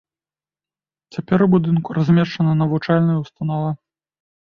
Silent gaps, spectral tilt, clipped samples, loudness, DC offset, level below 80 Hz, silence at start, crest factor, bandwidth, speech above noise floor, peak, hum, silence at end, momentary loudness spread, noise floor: none; -9 dB/octave; under 0.1%; -18 LUFS; under 0.1%; -56 dBFS; 1.15 s; 16 dB; 6.4 kHz; over 73 dB; -2 dBFS; none; 0.65 s; 11 LU; under -90 dBFS